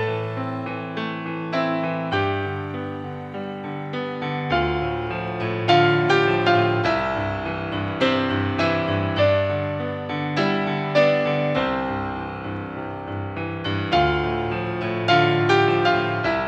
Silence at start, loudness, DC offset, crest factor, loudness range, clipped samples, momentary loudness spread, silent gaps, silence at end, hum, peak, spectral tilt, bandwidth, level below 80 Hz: 0 s; -22 LUFS; under 0.1%; 18 dB; 6 LU; under 0.1%; 12 LU; none; 0 s; none; -4 dBFS; -7 dB/octave; 8 kHz; -46 dBFS